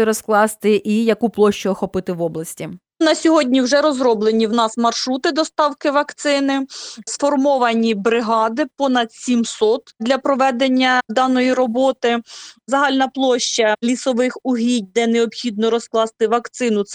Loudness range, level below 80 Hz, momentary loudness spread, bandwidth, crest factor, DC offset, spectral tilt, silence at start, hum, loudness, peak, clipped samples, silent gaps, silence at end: 2 LU; -60 dBFS; 6 LU; 15.5 kHz; 14 dB; under 0.1%; -4 dB/octave; 0 s; none; -17 LUFS; -2 dBFS; under 0.1%; none; 0 s